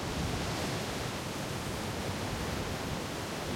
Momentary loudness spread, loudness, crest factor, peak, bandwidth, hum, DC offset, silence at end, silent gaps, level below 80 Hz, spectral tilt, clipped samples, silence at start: 3 LU; -35 LUFS; 14 dB; -22 dBFS; 16.5 kHz; none; under 0.1%; 0 s; none; -48 dBFS; -4.5 dB/octave; under 0.1%; 0 s